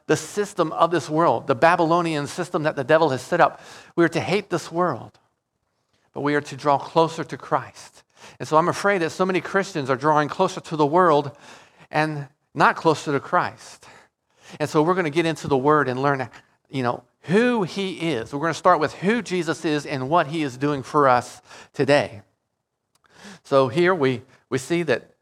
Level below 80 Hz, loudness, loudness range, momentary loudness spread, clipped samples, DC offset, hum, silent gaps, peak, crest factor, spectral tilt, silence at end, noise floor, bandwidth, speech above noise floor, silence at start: -64 dBFS; -22 LUFS; 4 LU; 10 LU; under 0.1%; under 0.1%; none; none; -2 dBFS; 20 dB; -5.5 dB/octave; 0.2 s; -77 dBFS; 14 kHz; 56 dB; 0.1 s